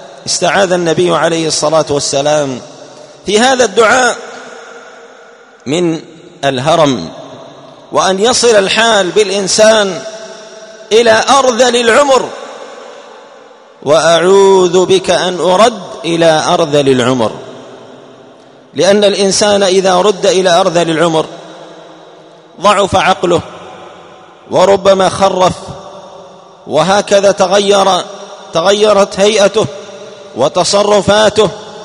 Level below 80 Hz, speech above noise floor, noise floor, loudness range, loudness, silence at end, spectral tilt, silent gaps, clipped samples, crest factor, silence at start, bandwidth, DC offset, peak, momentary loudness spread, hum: -48 dBFS; 29 dB; -38 dBFS; 4 LU; -10 LUFS; 0 s; -3.5 dB/octave; none; 0.4%; 10 dB; 0 s; 11 kHz; under 0.1%; 0 dBFS; 20 LU; none